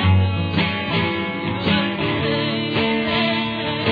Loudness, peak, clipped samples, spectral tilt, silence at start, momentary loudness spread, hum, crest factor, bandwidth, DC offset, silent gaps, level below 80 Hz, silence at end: -20 LUFS; -6 dBFS; under 0.1%; -8.5 dB/octave; 0 s; 4 LU; none; 14 dB; 5 kHz; under 0.1%; none; -44 dBFS; 0 s